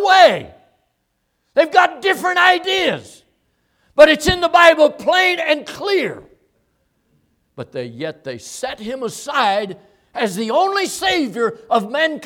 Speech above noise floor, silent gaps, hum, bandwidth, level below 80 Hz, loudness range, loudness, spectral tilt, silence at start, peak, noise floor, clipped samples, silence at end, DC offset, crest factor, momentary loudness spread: 53 dB; none; none; 17.5 kHz; -48 dBFS; 11 LU; -16 LUFS; -3 dB/octave; 0 s; 0 dBFS; -69 dBFS; under 0.1%; 0 s; under 0.1%; 18 dB; 18 LU